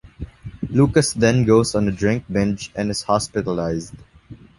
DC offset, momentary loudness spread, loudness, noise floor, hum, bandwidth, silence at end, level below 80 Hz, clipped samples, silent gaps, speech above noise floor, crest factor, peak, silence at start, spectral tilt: under 0.1%; 17 LU; -19 LUFS; -43 dBFS; none; 11.5 kHz; 0.25 s; -42 dBFS; under 0.1%; none; 25 dB; 18 dB; -2 dBFS; 0.05 s; -5.5 dB/octave